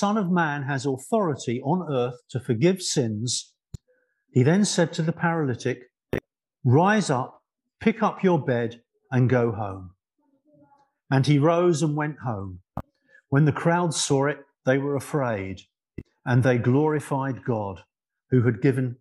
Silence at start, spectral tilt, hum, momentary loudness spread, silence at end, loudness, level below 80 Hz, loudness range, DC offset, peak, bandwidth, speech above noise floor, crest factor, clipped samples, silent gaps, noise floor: 0 s; -6 dB/octave; none; 14 LU; 0.05 s; -24 LUFS; -56 dBFS; 2 LU; under 0.1%; -6 dBFS; 12.5 kHz; 47 dB; 18 dB; under 0.1%; none; -70 dBFS